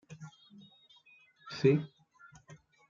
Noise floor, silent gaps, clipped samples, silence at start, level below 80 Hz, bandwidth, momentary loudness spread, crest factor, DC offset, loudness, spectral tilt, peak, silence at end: -63 dBFS; none; under 0.1%; 0.1 s; -76 dBFS; 7.4 kHz; 26 LU; 24 dB; under 0.1%; -31 LUFS; -7.5 dB/octave; -14 dBFS; 0.35 s